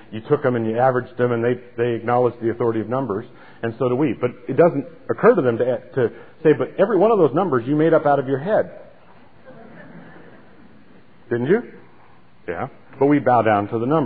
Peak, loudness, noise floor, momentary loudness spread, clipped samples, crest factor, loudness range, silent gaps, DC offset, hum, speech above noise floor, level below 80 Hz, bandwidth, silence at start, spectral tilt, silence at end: -4 dBFS; -20 LUFS; -52 dBFS; 13 LU; under 0.1%; 18 dB; 10 LU; none; 0.5%; none; 33 dB; -62 dBFS; 4.7 kHz; 0.1 s; -12 dB/octave; 0 s